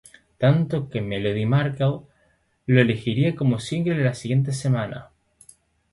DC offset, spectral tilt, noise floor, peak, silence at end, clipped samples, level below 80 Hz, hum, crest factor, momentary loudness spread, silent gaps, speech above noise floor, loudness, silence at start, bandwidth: under 0.1%; -7 dB/octave; -64 dBFS; -2 dBFS; 0.9 s; under 0.1%; -54 dBFS; none; 20 dB; 8 LU; none; 43 dB; -23 LUFS; 0.4 s; 11.5 kHz